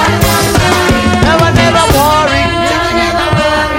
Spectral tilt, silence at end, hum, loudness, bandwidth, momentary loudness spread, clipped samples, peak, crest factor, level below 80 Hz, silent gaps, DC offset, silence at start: -4.5 dB/octave; 0 s; none; -9 LUFS; 17.5 kHz; 3 LU; 0.4%; 0 dBFS; 10 dB; -24 dBFS; none; under 0.1%; 0 s